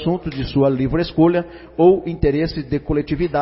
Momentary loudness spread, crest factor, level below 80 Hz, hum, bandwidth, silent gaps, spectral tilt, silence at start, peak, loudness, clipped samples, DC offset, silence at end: 8 LU; 16 dB; -34 dBFS; none; 5.8 kHz; none; -12 dB/octave; 0 s; -2 dBFS; -18 LUFS; under 0.1%; under 0.1%; 0 s